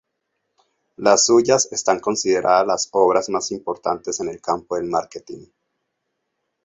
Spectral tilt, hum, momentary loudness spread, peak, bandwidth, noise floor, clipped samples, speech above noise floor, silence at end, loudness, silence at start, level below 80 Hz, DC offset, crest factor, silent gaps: -2.5 dB/octave; none; 11 LU; -2 dBFS; 8.2 kHz; -76 dBFS; under 0.1%; 57 dB; 1.2 s; -19 LUFS; 1 s; -60 dBFS; under 0.1%; 20 dB; none